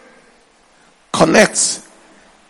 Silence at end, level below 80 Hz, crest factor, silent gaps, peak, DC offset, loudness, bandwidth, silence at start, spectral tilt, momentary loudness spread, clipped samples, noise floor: 0.7 s; -52 dBFS; 18 dB; none; 0 dBFS; under 0.1%; -13 LUFS; 19.5 kHz; 1.15 s; -3 dB/octave; 14 LU; 0.1%; -51 dBFS